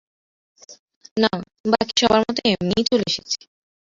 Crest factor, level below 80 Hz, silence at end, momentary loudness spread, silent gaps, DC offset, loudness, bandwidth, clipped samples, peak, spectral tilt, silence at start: 22 dB; -54 dBFS; 0.65 s; 10 LU; 0.79-0.88 s, 0.96-1.01 s, 1.11-1.16 s, 1.60-1.64 s; under 0.1%; -20 LUFS; 7.6 kHz; under 0.1%; -2 dBFS; -4 dB/octave; 0.7 s